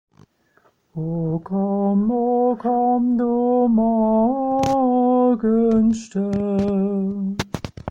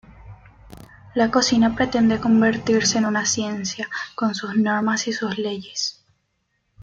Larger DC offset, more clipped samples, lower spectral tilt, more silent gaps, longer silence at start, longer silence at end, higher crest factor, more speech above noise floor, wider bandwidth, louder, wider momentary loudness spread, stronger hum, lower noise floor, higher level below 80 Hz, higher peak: neither; neither; first, -8 dB/octave vs -3.5 dB/octave; neither; first, 0.95 s vs 0.1 s; about the same, 0 s vs 0 s; about the same, 12 dB vs 16 dB; second, 41 dB vs 51 dB; about the same, 8.2 kHz vs 7.8 kHz; about the same, -19 LUFS vs -21 LUFS; about the same, 8 LU vs 9 LU; neither; second, -60 dBFS vs -71 dBFS; about the same, -48 dBFS vs -52 dBFS; about the same, -6 dBFS vs -6 dBFS